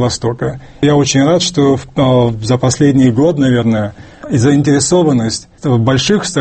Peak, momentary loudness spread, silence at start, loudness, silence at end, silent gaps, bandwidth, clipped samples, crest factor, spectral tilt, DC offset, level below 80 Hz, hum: 0 dBFS; 8 LU; 0 s; -12 LUFS; 0 s; none; 8.8 kHz; under 0.1%; 12 dB; -5.5 dB/octave; under 0.1%; -40 dBFS; none